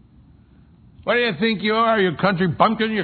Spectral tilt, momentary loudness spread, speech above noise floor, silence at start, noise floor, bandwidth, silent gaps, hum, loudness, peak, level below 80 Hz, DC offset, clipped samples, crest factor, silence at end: -9 dB/octave; 3 LU; 31 dB; 1.05 s; -50 dBFS; 4.6 kHz; none; none; -19 LUFS; -2 dBFS; -54 dBFS; under 0.1%; under 0.1%; 20 dB; 0 s